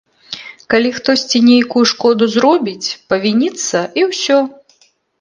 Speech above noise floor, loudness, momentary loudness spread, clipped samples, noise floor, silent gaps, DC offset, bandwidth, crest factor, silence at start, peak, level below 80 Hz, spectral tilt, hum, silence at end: 41 dB; -13 LUFS; 13 LU; under 0.1%; -54 dBFS; none; under 0.1%; 9.8 kHz; 14 dB; 0.3 s; 0 dBFS; -58 dBFS; -3.5 dB/octave; none; 0.7 s